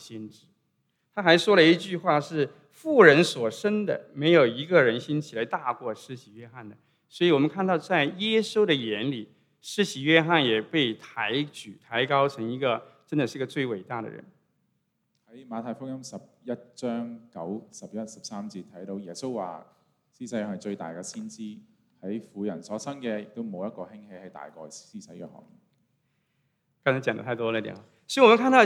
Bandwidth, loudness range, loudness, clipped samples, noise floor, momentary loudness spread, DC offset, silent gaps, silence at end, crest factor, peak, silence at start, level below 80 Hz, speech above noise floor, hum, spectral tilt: 14 kHz; 16 LU; -25 LUFS; under 0.1%; -75 dBFS; 22 LU; under 0.1%; none; 0 s; 24 dB; -2 dBFS; 0 s; -82 dBFS; 49 dB; none; -5 dB/octave